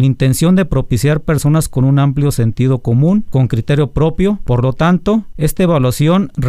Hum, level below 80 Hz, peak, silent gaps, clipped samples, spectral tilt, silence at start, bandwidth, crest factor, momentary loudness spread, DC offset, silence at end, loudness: none; -28 dBFS; -2 dBFS; none; under 0.1%; -7 dB/octave; 0 s; 16 kHz; 10 dB; 3 LU; under 0.1%; 0 s; -13 LUFS